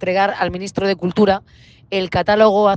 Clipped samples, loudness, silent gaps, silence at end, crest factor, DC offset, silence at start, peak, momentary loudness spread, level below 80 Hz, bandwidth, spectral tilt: under 0.1%; -17 LUFS; none; 0 s; 16 dB; under 0.1%; 0 s; 0 dBFS; 9 LU; -46 dBFS; 9.2 kHz; -6 dB/octave